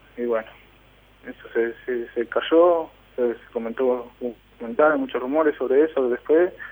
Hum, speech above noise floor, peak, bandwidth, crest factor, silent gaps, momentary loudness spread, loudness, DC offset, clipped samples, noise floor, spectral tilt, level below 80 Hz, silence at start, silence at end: none; 31 dB; -6 dBFS; over 20 kHz; 18 dB; none; 15 LU; -22 LUFS; under 0.1%; under 0.1%; -53 dBFS; -7 dB/octave; -58 dBFS; 0.15 s; 0 s